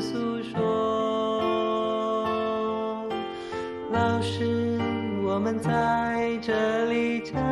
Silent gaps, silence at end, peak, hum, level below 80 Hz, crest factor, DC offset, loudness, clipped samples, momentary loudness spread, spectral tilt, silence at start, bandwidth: none; 0 s; -12 dBFS; none; -56 dBFS; 16 dB; under 0.1%; -27 LUFS; under 0.1%; 6 LU; -6.5 dB/octave; 0 s; 11.5 kHz